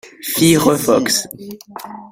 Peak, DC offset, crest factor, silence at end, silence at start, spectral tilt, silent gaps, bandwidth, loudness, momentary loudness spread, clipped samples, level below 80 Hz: 0 dBFS; under 0.1%; 16 dB; 0.05 s; 0.05 s; -4 dB/octave; none; 16.5 kHz; -14 LUFS; 20 LU; under 0.1%; -52 dBFS